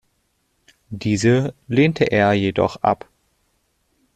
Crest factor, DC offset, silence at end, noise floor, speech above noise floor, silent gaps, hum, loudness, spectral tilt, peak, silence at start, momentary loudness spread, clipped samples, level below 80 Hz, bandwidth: 18 dB; under 0.1%; 1.2 s; -68 dBFS; 50 dB; none; none; -19 LUFS; -6.5 dB/octave; -2 dBFS; 0.9 s; 9 LU; under 0.1%; -52 dBFS; 11.5 kHz